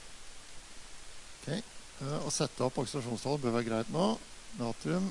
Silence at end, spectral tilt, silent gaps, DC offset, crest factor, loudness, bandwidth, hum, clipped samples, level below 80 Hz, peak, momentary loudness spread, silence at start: 0 s; -5 dB/octave; none; under 0.1%; 18 dB; -35 LUFS; 11.5 kHz; none; under 0.1%; -56 dBFS; -16 dBFS; 18 LU; 0 s